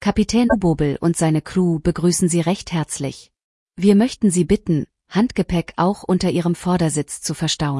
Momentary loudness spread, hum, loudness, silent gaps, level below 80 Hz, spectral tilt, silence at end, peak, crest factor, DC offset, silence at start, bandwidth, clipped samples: 7 LU; none; -19 LUFS; 3.44-3.66 s; -40 dBFS; -5.5 dB/octave; 0 s; -4 dBFS; 16 dB; under 0.1%; 0 s; 12 kHz; under 0.1%